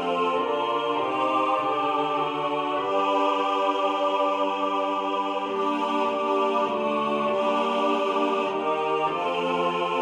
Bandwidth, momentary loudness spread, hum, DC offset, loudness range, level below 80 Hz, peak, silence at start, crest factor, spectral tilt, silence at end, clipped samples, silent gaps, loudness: 11 kHz; 3 LU; none; under 0.1%; 1 LU; -74 dBFS; -10 dBFS; 0 s; 14 dB; -5 dB/octave; 0 s; under 0.1%; none; -25 LUFS